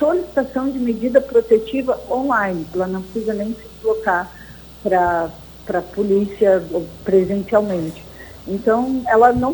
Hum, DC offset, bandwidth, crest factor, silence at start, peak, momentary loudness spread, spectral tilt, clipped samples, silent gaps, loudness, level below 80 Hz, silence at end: none; under 0.1%; over 20 kHz; 16 dB; 0 s; -2 dBFS; 12 LU; -7 dB/octave; under 0.1%; none; -19 LUFS; -44 dBFS; 0 s